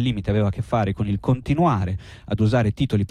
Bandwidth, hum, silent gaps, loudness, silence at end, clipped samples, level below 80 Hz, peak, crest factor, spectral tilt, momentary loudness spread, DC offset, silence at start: 10 kHz; none; none; -22 LUFS; 0.05 s; under 0.1%; -40 dBFS; -10 dBFS; 12 dB; -8 dB/octave; 6 LU; under 0.1%; 0 s